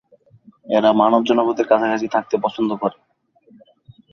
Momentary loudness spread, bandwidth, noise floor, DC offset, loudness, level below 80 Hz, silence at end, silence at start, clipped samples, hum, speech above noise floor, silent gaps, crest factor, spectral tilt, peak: 7 LU; 6.8 kHz; -55 dBFS; under 0.1%; -18 LUFS; -64 dBFS; 1.2 s; 0.65 s; under 0.1%; none; 38 dB; none; 18 dB; -6 dB/octave; -2 dBFS